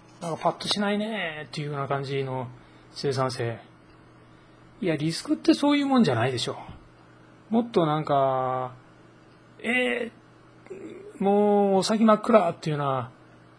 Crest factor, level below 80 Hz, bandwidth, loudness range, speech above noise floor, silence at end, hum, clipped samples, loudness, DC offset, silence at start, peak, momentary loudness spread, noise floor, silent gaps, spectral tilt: 22 dB; -64 dBFS; 10.5 kHz; 7 LU; 29 dB; 0.5 s; none; under 0.1%; -25 LUFS; under 0.1%; 0.2 s; -4 dBFS; 17 LU; -53 dBFS; none; -5.5 dB/octave